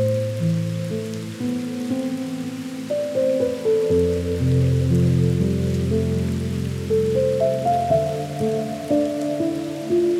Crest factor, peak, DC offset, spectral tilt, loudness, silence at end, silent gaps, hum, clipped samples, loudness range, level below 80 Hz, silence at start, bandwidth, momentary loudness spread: 12 dB; -8 dBFS; under 0.1%; -7.5 dB/octave; -22 LUFS; 0 s; none; none; under 0.1%; 5 LU; -42 dBFS; 0 s; 15 kHz; 8 LU